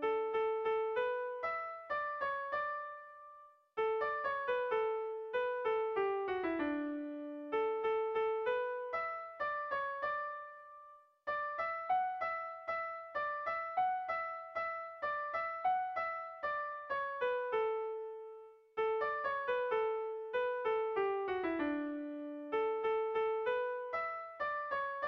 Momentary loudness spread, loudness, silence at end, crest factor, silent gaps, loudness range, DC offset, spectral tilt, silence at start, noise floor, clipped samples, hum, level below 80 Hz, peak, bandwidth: 8 LU; -37 LUFS; 0 s; 12 dB; none; 3 LU; under 0.1%; -1.5 dB/octave; 0 s; -59 dBFS; under 0.1%; none; -74 dBFS; -24 dBFS; 5.8 kHz